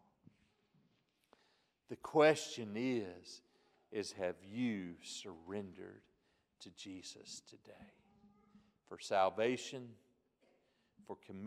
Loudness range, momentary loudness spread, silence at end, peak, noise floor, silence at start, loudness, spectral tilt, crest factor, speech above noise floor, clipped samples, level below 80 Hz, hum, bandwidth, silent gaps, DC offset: 14 LU; 24 LU; 0 s; -18 dBFS; -78 dBFS; 1.9 s; -39 LUFS; -4.5 dB/octave; 24 dB; 38 dB; under 0.1%; -84 dBFS; none; 14 kHz; none; under 0.1%